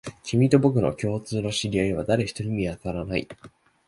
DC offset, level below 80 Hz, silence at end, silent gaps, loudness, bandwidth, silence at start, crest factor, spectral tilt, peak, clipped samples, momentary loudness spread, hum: under 0.1%; -48 dBFS; 0.4 s; none; -25 LUFS; 11.5 kHz; 0.05 s; 20 dB; -6.5 dB/octave; -4 dBFS; under 0.1%; 10 LU; none